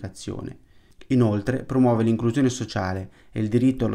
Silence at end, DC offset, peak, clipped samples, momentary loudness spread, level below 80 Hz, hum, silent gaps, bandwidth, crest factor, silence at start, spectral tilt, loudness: 0 s; under 0.1%; -8 dBFS; under 0.1%; 14 LU; -50 dBFS; none; none; 11 kHz; 14 dB; 0 s; -7 dB/octave; -23 LUFS